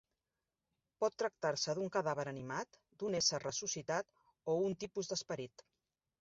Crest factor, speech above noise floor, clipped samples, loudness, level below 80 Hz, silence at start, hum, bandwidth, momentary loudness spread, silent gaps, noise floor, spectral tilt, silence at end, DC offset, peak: 22 dB; over 51 dB; under 0.1%; -39 LUFS; -76 dBFS; 1 s; none; 7.6 kHz; 11 LU; none; under -90 dBFS; -3 dB/octave; 0.75 s; under 0.1%; -20 dBFS